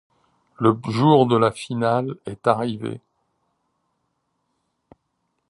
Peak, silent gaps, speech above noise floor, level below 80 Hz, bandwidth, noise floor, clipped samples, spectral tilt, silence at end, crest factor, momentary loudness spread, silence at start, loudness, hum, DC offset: -2 dBFS; none; 54 dB; -62 dBFS; 11.5 kHz; -74 dBFS; under 0.1%; -7.5 dB/octave; 2.5 s; 20 dB; 15 LU; 0.6 s; -20 LUFS; none; under 0.1%